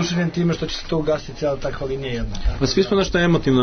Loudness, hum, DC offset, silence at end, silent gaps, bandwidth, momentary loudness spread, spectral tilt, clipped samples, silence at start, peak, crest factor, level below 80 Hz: -21 LUFS; none; under 0.1%; 0 s; none; 6.6 kHz; 8 LU; -5.5 dB/octave; under 0.1%; 0 s; -6 dBFS; 14 dB; -30 dBFS